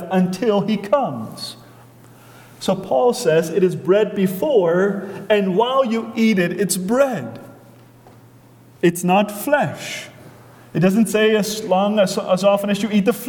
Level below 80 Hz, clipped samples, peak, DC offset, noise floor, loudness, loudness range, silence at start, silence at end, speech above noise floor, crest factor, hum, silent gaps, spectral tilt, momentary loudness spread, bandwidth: -60 dBFS; under 0.1%; -4 dBFS; under 0.1%; -47 dBFS; -18 LUFS; 4 LU; 0 s; 0 s; 29 dB; 16 dB; none; none; -5.5 dB/octave; 12 LU; 19 kHz